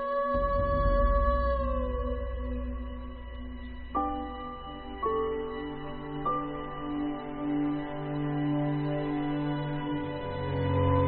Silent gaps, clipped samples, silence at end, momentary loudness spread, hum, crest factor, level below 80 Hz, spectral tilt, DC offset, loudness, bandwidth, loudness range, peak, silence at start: none; under 0.1%; 0 s; 13 LU; none; 16 dB; -36 dBFS; -11.5 dB/octave; under 0.1%; -31 LUFS; 4.8 kHz; 5 LU; -14 dBFS; 0 s